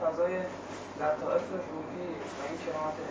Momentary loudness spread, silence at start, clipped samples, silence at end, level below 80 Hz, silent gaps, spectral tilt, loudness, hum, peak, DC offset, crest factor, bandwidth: 8 LU; 0 s; under 0.1%; 0 s; -64 dBFS; none; -5.5 dB/octave; -34 LUFS; none; -16 dBFS; under 0.1%; 18 dB; 8 kHz